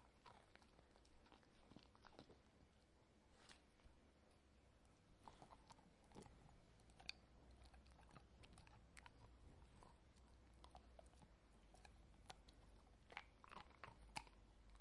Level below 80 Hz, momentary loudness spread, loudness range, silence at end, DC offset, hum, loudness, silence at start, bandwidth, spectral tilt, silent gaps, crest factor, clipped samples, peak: -72 dBFS; 11 LU; 6 LU; 0 s; under 0.1%; none; -65 LUFS; 0 s; 11 kHz; -3.5 dB/octave; none; 36 dB; under 0.1%; -30 dBFS